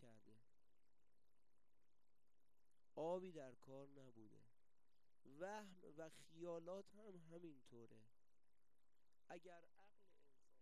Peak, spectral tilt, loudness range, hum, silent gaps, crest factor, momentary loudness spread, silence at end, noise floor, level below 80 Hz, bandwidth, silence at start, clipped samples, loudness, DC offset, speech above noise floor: -36 dBFS; -6 dB/octave; 10 LU; none; none; 24 dB; 17 LU; 0.6 s; under -90 dBFS; under -90 dBFS; 13 kHz; 0 s; under 0.1%; -57 LUFS; under 0.1%; over 31 dB